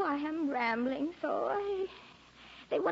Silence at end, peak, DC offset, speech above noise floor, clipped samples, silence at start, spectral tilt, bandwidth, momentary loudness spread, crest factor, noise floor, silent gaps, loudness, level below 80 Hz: 0 s; -20 dBFS; under 0.1%; 22 dB; under 0.1%; 0 s; -2.5 dB/octave; 7.6 kHz; 21 LU; 14 dB; -55 dBFS; none; -34 LUFS; -68 dBFS